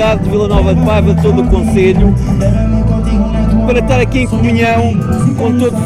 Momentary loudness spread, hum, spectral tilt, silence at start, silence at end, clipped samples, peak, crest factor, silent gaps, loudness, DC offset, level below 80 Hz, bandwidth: 3 LU; none; -7.5 dB/octave; 0 s; 0 s; under 0.1%; 0 dBFS; 10 dB; none; -11 LUFS; under 0.1%; -18 dBFS; 12.5 kHz